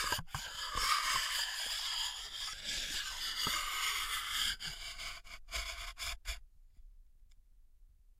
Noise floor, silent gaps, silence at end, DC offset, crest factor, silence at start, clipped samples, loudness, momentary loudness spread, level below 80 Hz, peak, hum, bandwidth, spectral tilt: -62 dBFS; none; 0.1 s; under 0.1%; 22 dB; 0 s; under 0.1%; -36 LUFS; 10 LU; -52 dBFS; -16 dBFS; none; 16 kHz; 0.5 dB/octave